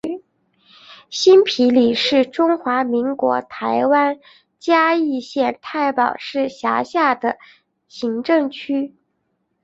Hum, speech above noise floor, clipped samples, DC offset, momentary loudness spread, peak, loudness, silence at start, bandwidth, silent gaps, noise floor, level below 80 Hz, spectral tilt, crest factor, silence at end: none; 53 dB; under 0.1%; under 0.1%; 11 LU; -2 dBFS; -18 LUFS; 0.05 s; 8 kHz; none; -70 dBFS; -64 dBFS; -4 dB/octave; 16 dB; 0.75 s